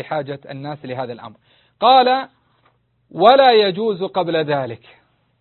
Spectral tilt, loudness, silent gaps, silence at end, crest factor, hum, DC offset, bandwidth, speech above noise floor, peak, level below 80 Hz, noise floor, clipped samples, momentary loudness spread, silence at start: -8 dB/octave; -16 LUFS; none; 0.65 s; 18 dB; none; under 0.1%; 4.4 kHz; 44 dB; 0 dBFS; -64 dBFS; -61 dBFS; under 0.1%; 20 LU; 0 s